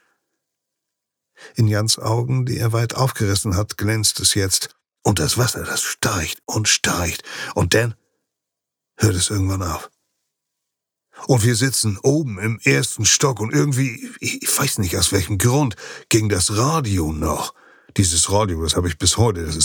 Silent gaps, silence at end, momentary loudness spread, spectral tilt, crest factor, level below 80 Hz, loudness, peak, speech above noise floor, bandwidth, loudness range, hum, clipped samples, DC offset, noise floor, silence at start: none; 0 s; 8 LU; -3.5 dB/octave; 18 dB; -44 dBFS; -19 LUFS; -2 dBFS; 64 dB; over 20 kHz; 4 LU; none; under 0.1%; under 0.1%; -83 dBFS; 1.4 s